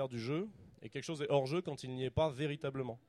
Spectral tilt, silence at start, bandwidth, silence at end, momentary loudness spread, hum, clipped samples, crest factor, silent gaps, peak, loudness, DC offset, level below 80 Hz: -6.5 dB/octave; 0 s; 12.5 kHz; 0.1 s; 12 LU; none; under 0.1%; 20 dB; none; -18 dBFS; -38 LUFS; under 0.1%; -62 dBFS